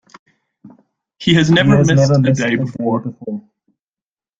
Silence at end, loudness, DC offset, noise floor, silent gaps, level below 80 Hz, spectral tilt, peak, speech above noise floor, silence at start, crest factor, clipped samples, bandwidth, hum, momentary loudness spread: 1 s; -14 LUFS; under 0.1%; under -90 dBFS; none; -48 dBFS; -6 dB/octave; 0 dBFS; over 77 dB; 0.65 s; 16 dB; under 0.1%; 7.8 kHz; none; 16 LU